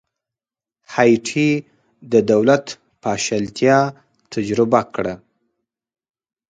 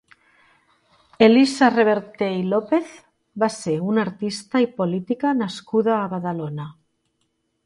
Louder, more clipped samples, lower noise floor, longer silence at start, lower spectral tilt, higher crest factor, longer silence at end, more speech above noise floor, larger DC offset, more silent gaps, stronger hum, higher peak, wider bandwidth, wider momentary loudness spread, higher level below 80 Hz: first, -18 LUFS vs -21 LUFS; neither; first, under -90 dBFS vs -71 dBFS; second, 0.9 s vs 1.2 s; about the same, -5.5 dB/octave vs -6 dB/octave; about the same, 20 dB vs 20 dB; first, 1.35 s vs 0.95 s; first, over 73 dB vs 51 dB; neither; neither; neither; about the same, 0 dBFS vs -2 dBFS; second, 9.4 kHz vs 11.5 kHz; about the same, 12 LU vs 13 LU; first, -58 dBFS vs -66 dBFS